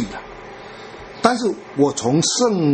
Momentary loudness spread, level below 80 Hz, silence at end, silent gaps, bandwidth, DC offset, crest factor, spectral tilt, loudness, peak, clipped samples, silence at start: 19 LU; -52 dBFS; 0 s; none; 8.8 kHz; under 0.1%; 20 dB; -4.5 dB/octave; -19 LUFS; 0 dBFS; under 0.1%; 0 s